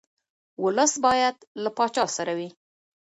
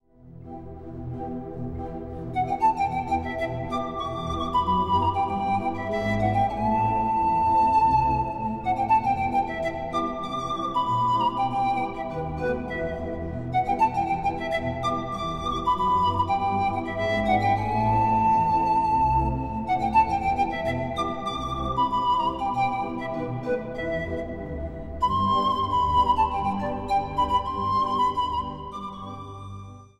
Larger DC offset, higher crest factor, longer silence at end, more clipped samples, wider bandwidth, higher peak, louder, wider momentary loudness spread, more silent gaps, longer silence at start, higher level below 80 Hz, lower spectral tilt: neither; about the same, 18 dB vs 16 dB; first, 0.55 s vs 0.15 s; neither; about the same, 11 kHz vs 11.5 kHz; about the same, -8 dBFS vs -8 dBFS; about the same, -24 LUFS vs -25 LUFS; about the same, 11 LU vs 12 LU; first, 1.47-1.55 s vs none; first, 0.6 s vs 0.25 s; second, -66 dBFS vs -42 dBFS; second, -2.5 dB/octave vs -6.5 dB/octave